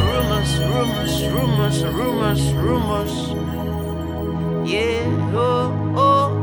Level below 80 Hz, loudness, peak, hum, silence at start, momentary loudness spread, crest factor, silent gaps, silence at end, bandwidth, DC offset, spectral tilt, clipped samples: -32 dBFS; -20 LUFS; -4 dBFS; none; 0 s; 7 LU; 14 dB; none; 0 s; over 20 kHz; under 0.1%; -6 dB/octave; under 0.1%